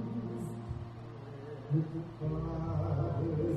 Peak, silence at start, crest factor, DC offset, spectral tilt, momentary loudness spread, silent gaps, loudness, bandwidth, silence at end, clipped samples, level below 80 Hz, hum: -20 dBFS; 0 s; 16 dB; under 0.1%; -9.5 dB/octave; 12 LU; none; -37 LUFS; 8.8 kHz; 0 s; under 0.1%; -52 dBFS; none